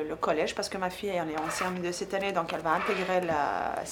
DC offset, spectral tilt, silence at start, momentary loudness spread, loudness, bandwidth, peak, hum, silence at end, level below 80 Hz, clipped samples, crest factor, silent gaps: under 0.1%; -4 dB/octave; 0 s; 4 LU; -30 LUFS; 19.5 kHz; -12 dBFS; none; 0 s; -60 dBFS; under 0.1%; 18 dB; none